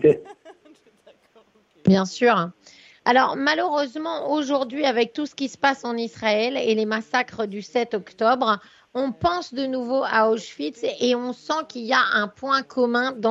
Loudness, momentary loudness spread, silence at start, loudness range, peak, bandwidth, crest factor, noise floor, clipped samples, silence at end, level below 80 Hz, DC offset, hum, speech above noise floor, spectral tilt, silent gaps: -23 LUFS; 8 LU; 0 s; 2 LU; -4 dBFS; 8 kHz; 20 dB; -57 dBFS; under 0.1%; 0 s; -60 dBFS; under 0.1%; none; 35 dB; -5 dB/octave; none